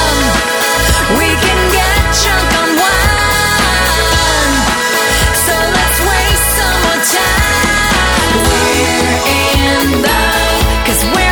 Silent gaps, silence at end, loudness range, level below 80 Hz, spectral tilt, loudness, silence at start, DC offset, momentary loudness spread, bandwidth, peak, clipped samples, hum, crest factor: none; 0 s; 0 LU; -18 dBFS; -3 dB/octave; -10 LUFS; 0 s; under 0.1%; 1 LU; over 20 kHz; 0 dBFS; under 0.1%; none; 10 dB